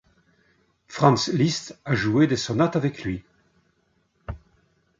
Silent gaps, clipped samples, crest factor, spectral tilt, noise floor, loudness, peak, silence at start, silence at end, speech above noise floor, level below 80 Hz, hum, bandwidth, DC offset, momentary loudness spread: none; under 0.1%; 22 dB; -5.5 dB/octave; -68 dBFS; -23 LUFS; -2 dBFS; 0.9 s; 0.65 s; 46 dB; -50 dBFS; none; 7.8 kHz; under 0.1%; 20 LU